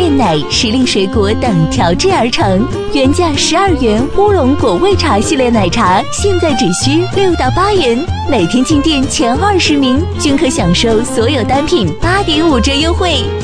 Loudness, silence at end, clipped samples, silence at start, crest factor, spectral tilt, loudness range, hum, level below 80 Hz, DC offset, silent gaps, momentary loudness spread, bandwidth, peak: -11 LUFS; 0 s; under 0.1%; 0 s; 10 dB; -5 dB/octave; 1 LU; none; -26 dBFS; under 0.1%; none; 3 LU; 11 kHz; 0 dBFS